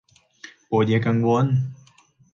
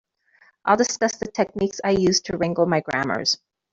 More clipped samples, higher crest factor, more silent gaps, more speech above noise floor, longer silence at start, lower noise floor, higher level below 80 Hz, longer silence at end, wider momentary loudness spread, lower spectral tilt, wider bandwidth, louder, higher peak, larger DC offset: neither; about the same, 16 dB vs 20 dB; neither; about the same, 37 dB vs 37 dB; about the same, 0.7 s vs 0.65 s; about the same, -56 dBFS vs -59 dBFS; second, -60 dBFS vs -54 dBFS; first, 0.6 s vs 0.35 s; about the same, 6 LU vs 6 LU; first, -8 dB/octave vs -4 dB/octave; second, 7.2 kHz vs 8 kHz; about the same, -21 LUFS vs -22 LUFS; second, -8 dBFS vs -4 dBFS; neither